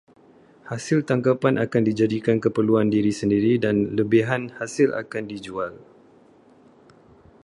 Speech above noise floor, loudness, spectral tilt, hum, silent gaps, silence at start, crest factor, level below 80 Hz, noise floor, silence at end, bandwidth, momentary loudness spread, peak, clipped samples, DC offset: 32 dB; -22 LUFS; -7 dB/octave; none; none; 0.65 s; 18 dB; -58 dBFS; -53 dBFS; 1.6 s; 11.5 kHz; 11 LU; -4 dBFS; under 0.1%; under 0.1%